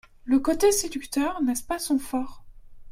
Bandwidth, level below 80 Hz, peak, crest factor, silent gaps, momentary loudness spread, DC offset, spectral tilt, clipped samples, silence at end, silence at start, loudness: 16 kHz; -46 dBFS; -10 dBFS; 16 dB; none; 10 LU; under 0.1%; -2.5 dB/octave; under 0.1%; 0 s; 0.25 s; -25 LUFS